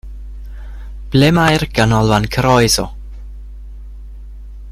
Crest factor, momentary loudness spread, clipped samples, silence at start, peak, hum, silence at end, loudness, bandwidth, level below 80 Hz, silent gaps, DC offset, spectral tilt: 16 dB; 24 LU; under 0.1%; 0.05 s; 0 dBFS; none; 0 s; -13 LUFS; 15.5 kHz; -30 dBFS; none; under 0.1%; -5 dB/octave